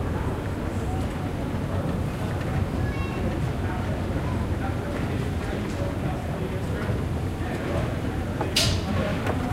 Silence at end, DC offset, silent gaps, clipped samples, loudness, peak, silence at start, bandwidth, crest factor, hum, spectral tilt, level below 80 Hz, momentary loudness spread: 0 s; under 0.1%; none; under 0.1%; -28 LUFS; -8 dBFS; 0 s; 16 kHz; 18 dB; none; -5.5 dB/octave; -36 dBFS; 4 LU